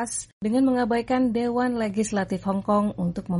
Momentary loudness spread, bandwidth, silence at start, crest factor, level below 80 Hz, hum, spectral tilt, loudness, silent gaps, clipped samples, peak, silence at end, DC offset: 5 LU; 11.5 kHz; 0 s; 12 dB; -52 dBFS; none; -6 dB/octave; -24 LUFS; 0.33-0.41 s; under 0.1%; -12 dBFS; 0 s; under 0.1%